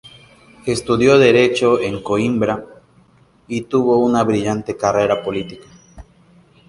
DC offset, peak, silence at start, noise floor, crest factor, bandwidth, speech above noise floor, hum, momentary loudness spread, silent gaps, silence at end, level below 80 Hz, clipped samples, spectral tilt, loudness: under 0.1%; 0 dBFS; 0.65 s; -52 dBFS; 18 dB; 11.5 kHz; 36 dB; none; 15 LU; none; 0.65 s; -48 dBFS; under 0.1%; -5.5 dB/octave; -16 LUFS